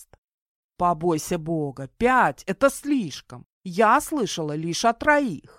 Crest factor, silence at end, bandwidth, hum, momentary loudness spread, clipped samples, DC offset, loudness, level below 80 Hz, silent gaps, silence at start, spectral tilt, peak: 20 dB; 0.2 s; 16.5 kHz; none; 11 LU; under 0.1%; under 0.1%; -23 LUFS; -52 dBFS; 0.18-0.69 s, 3.46-3.61 s; 0 s; -4.5 dB/octave; -4 dBFS